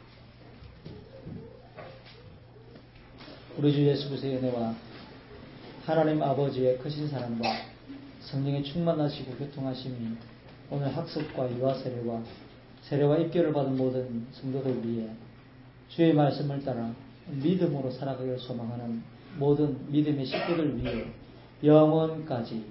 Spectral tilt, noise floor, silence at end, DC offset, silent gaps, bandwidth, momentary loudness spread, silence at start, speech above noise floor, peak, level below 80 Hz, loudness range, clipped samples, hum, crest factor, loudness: -11.5 dB/octave; -52 dBFS; 0 s; under 0.1%; none; 5.8 kHz; 22 LU; 0 s; 24 dB; -8 dBFS; -58 dBFS; 5 LU; under 0.1%; none; 22 dB; -29 LUFS